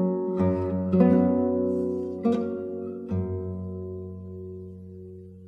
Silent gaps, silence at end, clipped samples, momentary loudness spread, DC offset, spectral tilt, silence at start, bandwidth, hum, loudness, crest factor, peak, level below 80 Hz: none; 0 s; under 0.1%; 20 LU; under 0.1%; -11 dB/octave; 0 s; 4.9 kHz; none; -26 LUFS; 18 dB; -8 dBFS; -56 dBFS